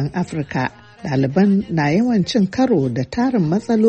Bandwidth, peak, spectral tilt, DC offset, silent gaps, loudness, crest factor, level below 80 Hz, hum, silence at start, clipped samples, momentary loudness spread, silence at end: 8.6 kHz; -4 dBFS; -7.5 dB/octave; under 0.1%; none; -18 LUFS; 14 dB; -48 dBFS; none; 0 s; under 0.1%; 7 LU; 0 s